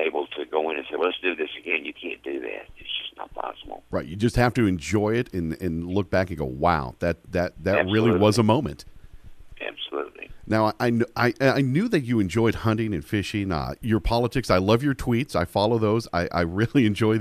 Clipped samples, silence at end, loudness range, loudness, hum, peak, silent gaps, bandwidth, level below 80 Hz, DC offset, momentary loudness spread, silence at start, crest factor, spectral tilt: under 0.1%; 0 s; 5 LU; -24 LUFS; none; -6 dBFS; none; 15 kHz; -42 dBFS; under 0.1%; 12 LU; 0 s; 18 dB; -6.5 dB/octave